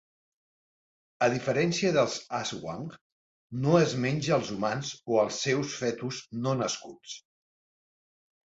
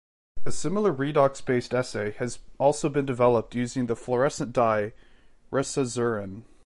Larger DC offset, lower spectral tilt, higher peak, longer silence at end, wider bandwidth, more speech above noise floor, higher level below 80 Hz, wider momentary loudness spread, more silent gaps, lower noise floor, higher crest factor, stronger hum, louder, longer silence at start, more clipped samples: neither; about the same, -5 dB/octave vs -5.5 dB/octave; about the same, -8 dBFS vs -8 dBFS; first, 1.35 s vs 0 s; second, 8 kHz vs 11.5 kHz; first, over 62 dB vs 24 dB; second, -66 dBFS vs -54 dBFS; first, 15 LU vs 10 LU; first, 3.01-3.50 s vs none; first, under -90 dBFS vs -49 dBFS; about the same, 22 dB vs 18 dB; neither; about the same, -28 LUFS vs -26 LUFS; first, 1.2 s vs 0.35 s; neither